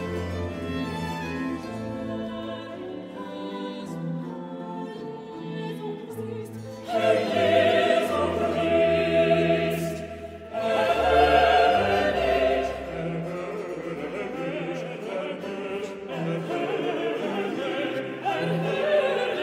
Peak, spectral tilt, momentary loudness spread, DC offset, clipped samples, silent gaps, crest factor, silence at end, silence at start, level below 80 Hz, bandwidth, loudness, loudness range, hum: -8 dBFS; -6 dB/octave; 15 LU; under 0.1%; under 0.1%; none; 18 dB; 0 s; 0 s; -48 dBFS; 16 kHz; -26 LUFS; 12 LU; none